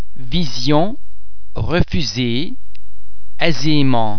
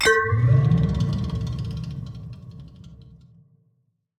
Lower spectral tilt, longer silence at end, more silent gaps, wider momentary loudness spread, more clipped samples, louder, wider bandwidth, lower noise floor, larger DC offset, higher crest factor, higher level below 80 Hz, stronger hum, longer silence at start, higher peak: about the same, -5.5 dB/octave vs -6 dB/octave; second, 0 s vs 1 s; neither; second, 12 LU vs 23 LU; neither; first, -19 LUFS vs -22 LUFS; second, 5.4 kHz vs 13.5 kHz; second, -40 dBFS vs -69 dBFS; first, 20% vs under 0.1%; about the same, 18 dB vs 18 dB; first, -32 dBFS vs -40 dBFS; neither; about the same, 0 s vs 0 s; first, 0 dBFS vs -6 dBFS